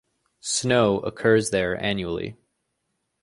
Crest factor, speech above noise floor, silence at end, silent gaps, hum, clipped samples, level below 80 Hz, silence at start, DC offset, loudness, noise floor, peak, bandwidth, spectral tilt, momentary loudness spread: 18 dB; 54 dB; 0.9 s; none; none; under 0.1%; -52 dBFS; 0.45 s; under 0.1%; -23 LUFS; -76 dBFS; -6 dBFS; 11.5 kHz; -4 dB/octave; 12 LU